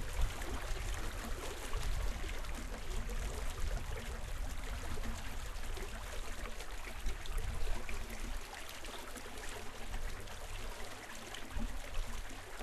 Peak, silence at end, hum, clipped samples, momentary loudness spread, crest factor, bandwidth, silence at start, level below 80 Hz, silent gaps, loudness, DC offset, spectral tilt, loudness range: -20 dBFS; 0 s; none; under 0.1%; 5 LU; 18 dB; 13.5 kHz; 0 s; -42 dBFS; none; -45 LUFS; under 0.1%; -3.5 dB/octave; 3 LU